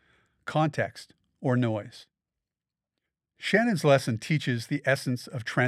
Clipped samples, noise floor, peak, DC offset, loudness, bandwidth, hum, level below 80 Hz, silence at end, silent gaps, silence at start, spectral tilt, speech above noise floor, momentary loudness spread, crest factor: under 0.1%; under -90 dBFS; -8 dBFS; under 0.1%; -27 LUFS; 14 kHz; none; -74 dBFS; 0 s; none; 0.45 s; -6 dB/octave; over 63 dB; 12 LU; 22 dB